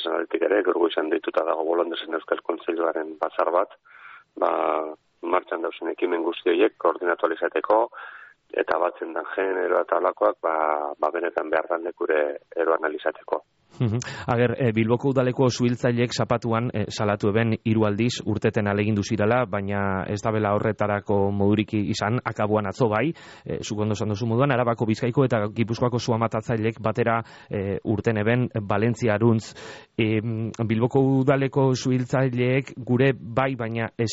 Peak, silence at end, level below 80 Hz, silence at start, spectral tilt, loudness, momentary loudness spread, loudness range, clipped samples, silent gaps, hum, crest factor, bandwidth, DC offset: -8 dBFS; 0 s; -58 dBFS; 0 s; -6 dB/octave; -24 LUFS; 7 LU; 3 LU; under 0.1%; none; none; 16 dB; 8 kHz; under 0.1%